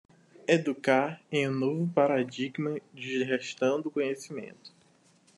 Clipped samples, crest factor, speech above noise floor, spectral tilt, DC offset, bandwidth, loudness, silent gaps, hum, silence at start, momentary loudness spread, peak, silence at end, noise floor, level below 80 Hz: under 0.1%; 22 dB; 34 dB; -6 dB/octave; under 0.1%; 11.5 kHz; -29 LUFS; none; none; 0.5 s; 11 LU; -8 dBFS; 0.7 s; -63 dBFS; -80 dBFS